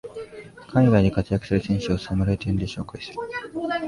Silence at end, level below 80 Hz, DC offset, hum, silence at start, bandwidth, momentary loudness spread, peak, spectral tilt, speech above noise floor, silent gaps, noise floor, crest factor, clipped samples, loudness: 0 s; -40 dBFS; under 0.1%; none; 0.05 s; 11.5 kHz; 18 LU; -6 dBFS; -7.5 dB/octave; 20 dB; none; -42 dBFS; 18 dB; under 0.1%; -24 LUFS